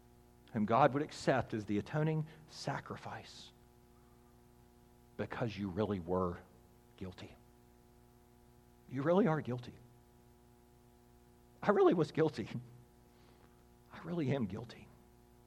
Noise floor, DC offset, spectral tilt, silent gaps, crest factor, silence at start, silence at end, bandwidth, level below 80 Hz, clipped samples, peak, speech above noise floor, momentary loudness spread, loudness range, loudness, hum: -64 dBFS; under 0.1%; -7 dB/octave; none; 26 dB; 0.5 s; 0.65 s; 14.5 kHz; -68 dBFS; under 0.1%; -14 dBFS; 29 dB; 23 LU; 8 LU; -36 LUFS; 60 Hz at -65 dBFS